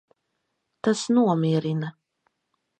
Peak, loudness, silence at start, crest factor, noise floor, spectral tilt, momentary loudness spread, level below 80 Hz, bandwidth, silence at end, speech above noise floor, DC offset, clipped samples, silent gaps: -8 dBFS; -24 LUFS; 0.85 s; 18 dB; -77 dBFS; -6.5 dB/octave; 9 LU; -72 dBFS; 9.2 kHz; 0.9 s; 55 dB; under 0.1%; under 0.1%; none